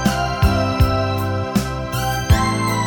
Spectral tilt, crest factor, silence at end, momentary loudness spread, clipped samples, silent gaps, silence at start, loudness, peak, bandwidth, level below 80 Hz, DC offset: -5.5 dB/octave; 16 dB; 0 s; 5 LU; under 0.1%; none; 0 s; -19 LUFS; -2 dBFS; 17.5 kHz; -24 dBFS; under 0.1%